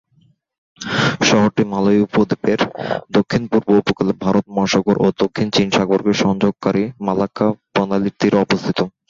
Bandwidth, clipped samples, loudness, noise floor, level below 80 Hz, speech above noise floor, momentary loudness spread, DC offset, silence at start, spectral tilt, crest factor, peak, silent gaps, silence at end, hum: 7.6 kHz; under 0.1%; -17 LUFS; -57 dBFS; -50 dBFS; 40 dB; 5 LU; under 0.1%; 0.8 s; -5.5 dB/octave; 16 dB; -2 dBFS; none; 0.2 s; none